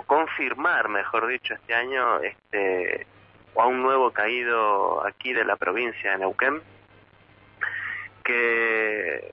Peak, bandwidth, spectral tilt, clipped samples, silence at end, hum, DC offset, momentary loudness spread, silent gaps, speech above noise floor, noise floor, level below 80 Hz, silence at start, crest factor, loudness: -8 dBFS; 5.8 kHz; -6.5 dB/octave; under 0.1%; 0.05 s; none; under 0.1%; 8 LU; none; 30 dB; -55 dBFS; -68 dBFS; 0.1 s; 16 dB; -24 LUFS